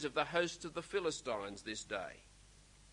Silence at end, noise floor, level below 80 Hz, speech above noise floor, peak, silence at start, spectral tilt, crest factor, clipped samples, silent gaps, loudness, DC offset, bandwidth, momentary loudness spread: 0 s; -62 dBFS; -66 dBFS; 22 dB; -18 dBFS; 0 s; -3 dB/octave; 22 dB; under 0.1%; none; -40 LUFS; under 0.1%; 11 kHz; 9 LU